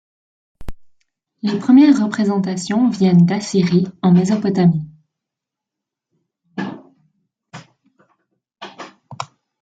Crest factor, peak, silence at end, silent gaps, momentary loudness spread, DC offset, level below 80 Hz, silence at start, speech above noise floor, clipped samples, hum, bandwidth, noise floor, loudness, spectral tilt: 16 dB; -2 dBFS; 0.4 s; none; 23 LU; under 0.1%; -48 dBFS; 0.6 s; 70 dB; under 0.1%; none; 9 kHz; -84 dBFS; -15 LUFS; -7 dB/octave